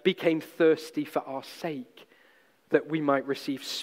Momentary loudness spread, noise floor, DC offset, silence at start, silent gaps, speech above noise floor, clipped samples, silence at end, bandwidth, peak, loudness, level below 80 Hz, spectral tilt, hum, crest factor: 12 LU; -62 dBFS; under 0.1%; 0.05 s; none; 34 dB; under 0.1%; 0 s; 16 kHz; -8 dBFS; -29 LUFS; -82 dBFS; -5 dB/octave; none; 20 dB